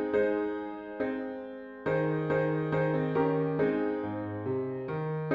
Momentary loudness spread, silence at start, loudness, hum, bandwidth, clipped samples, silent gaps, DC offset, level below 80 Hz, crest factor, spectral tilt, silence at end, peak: 9 LU; 0 s; -31 LUFS; none; 5.2 kHz; under 0.1%; none; under 0.1%; -64 dBFS; 16 dB; -10 dB/octave; 0 s; -16 dBFS